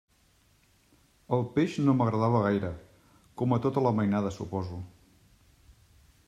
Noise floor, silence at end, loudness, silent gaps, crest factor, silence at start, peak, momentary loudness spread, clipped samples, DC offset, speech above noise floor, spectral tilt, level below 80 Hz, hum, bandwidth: -65 dBFS; 1.4 s; -28 LUFS; none; 20 dB; 1.3 s; -12 dBFS; 15 LU; under 0.1%; under 0.1%; 38 dB; -8.5 dB/octave; -60 dBFS; none; 9.8 kHz